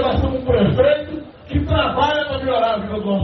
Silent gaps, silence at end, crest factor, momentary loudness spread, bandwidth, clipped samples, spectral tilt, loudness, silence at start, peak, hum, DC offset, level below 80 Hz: none; 0 s; 14 dB; 8 LU; 6.2 kHz; under 0.1%; -5 dB/octave; -18 LUFS; 0 s; -4 dBFS; none; under 0.1%; -34 dBFS